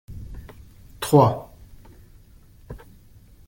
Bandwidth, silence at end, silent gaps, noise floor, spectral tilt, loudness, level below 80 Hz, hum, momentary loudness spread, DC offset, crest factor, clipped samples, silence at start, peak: 17 kHz; 0.7 s; none; -50 dBFS; -7 dB/octave; -20 LUFS; -46 dBFS; none; 26 LU; under 0.1%; 22 dB; under 0.1%; 0.1 s; -4 dBFS